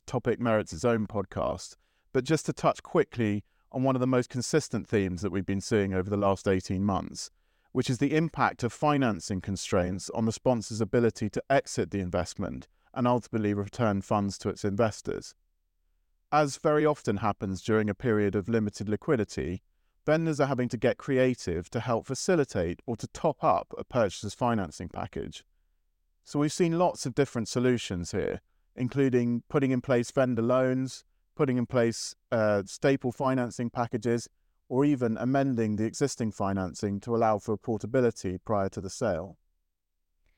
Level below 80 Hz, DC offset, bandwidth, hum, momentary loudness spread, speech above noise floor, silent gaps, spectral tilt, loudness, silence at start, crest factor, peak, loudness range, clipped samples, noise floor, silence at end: -56 dBFS; under 0.1%; 16.5 kHz; none; 9 LU; 53 dB; none; -6 dB/octave; -29 LUFS; 0.05 s; 18 dB; -10 dBFS; 2 LU; under 0.1%; -81 dBFS; 1.05 s